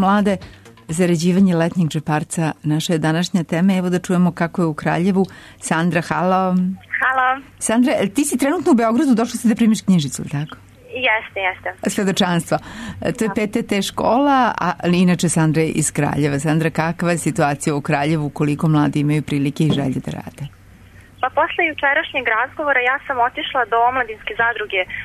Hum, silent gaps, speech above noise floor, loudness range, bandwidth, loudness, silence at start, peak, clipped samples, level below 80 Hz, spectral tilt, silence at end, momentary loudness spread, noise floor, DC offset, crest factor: none; none; 26 dB; 3 LU; 13.5 kHz; -18 LUFS; 0 s; -6 dBFS; under 0.1%; -50 dBFS; -5.5 dB/octave; 0 s; 8 LU; -44 dBFS; under 0.1%; 12 dB